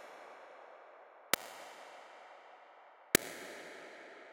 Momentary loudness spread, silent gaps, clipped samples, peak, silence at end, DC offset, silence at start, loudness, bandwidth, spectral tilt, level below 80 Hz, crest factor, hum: 25 LU; none; under 0.1%; -4 dBFS; 0 s; under 0.1%; 0 s; -36 LUFS; 17 kHz; -1.5 dB/octave; -72 dBFS; 38 dB; none